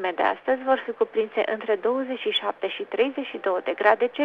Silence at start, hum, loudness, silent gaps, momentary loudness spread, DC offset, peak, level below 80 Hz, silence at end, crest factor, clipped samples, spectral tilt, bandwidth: 0 s; none; -25 LUFS; none; 6 LU; under 0.1%; -4 dBFS; -72 dBFS; 0 s; 22 dB; under 0.1%; -5 dB/octave; 5.4 kHz